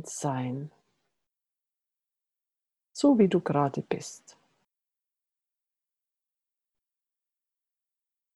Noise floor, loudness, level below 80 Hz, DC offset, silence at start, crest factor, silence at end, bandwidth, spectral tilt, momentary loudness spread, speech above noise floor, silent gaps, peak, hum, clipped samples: -89 dBFS; -27 LUFS; -74 dBFS; under 0.1%; 0 s; 22 dB; 4.2 s; 12 kHz; -6.5 dB/octave; 20 LU; 63 dB; none; -10 dBFS; none; under 0.1%